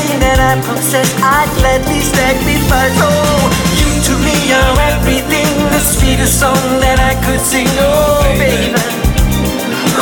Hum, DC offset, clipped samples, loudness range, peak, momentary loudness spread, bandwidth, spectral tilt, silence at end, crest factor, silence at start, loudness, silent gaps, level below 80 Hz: none; under 0.1%; under 0.1%; 0 LU; 0 dBFS; 3 LU; 18 kHz; -4 dB/octave; 0 s; 10 dB; 0 s; -11 LUFS; none; -18 dBFS